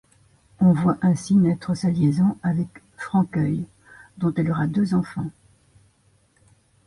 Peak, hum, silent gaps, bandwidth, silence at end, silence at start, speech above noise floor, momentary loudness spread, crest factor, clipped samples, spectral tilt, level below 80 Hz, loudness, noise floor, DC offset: -8 dBFS; none; none; 11.5 kHz; 1.55 s; 0.6 s; 41 dB; 12 LU; 14 dB; under 0.1%; -8 dB/octave; -54 dBFS; -22 LUFS; -61 dBFS; under 0.1%